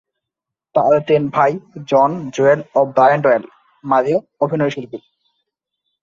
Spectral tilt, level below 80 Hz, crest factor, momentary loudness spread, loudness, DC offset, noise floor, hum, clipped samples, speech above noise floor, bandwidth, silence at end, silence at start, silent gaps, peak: -7 dB/octave; -62 dBFS; 16 dB; 13 LU; -16 LUFS; under 0.1%; -84 dBFS; none; under 0.1%; 68 dB; 7.4 kHz; 1.05 s; 0.75 s; none; -2 dBFS